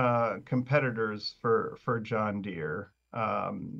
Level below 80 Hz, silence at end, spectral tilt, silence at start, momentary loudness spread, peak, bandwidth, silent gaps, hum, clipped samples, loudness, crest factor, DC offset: -68 dBFS; 0 s; -8 dB/octave; 0 s; 8 LU; -10 dBFS; 7.2 kHz; none; none; under 0.1%; -31 LUFS; 20 dB; under 0.1%